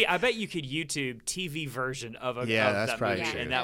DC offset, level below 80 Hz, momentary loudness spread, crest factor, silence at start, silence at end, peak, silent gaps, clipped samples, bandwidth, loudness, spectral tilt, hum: under 0.1%; -58 dBFS; 8 LU; 22 dB; 0 s; 0 s; -8 dBFS; none; under 0.1%; 17 kHz; -29 LUFS; -3.5 dB/octave; none